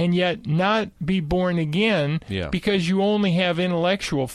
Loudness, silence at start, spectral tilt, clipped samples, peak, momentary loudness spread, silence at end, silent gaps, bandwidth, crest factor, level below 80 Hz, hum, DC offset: -22 LUFS; 0 s; -6.5 dB/octave; under 0.1%; -8 dBFS; 5 LU; 0 s; none; 12 kHz; 12 dB; -46 dBFS; none; under 0.1%